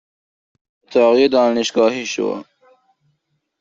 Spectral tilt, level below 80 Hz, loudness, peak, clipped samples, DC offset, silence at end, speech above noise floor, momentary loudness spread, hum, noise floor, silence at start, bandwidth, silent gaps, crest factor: -3.5 dB/octave; -64 dBFS; -16 LUFS; -2 dBFS; under 0.1%; under 0.1%; 1.2 s; 54 dB; 10 LU; none; -70 dBFS; 0.9 s; 7.8 kHz; none; 16 dB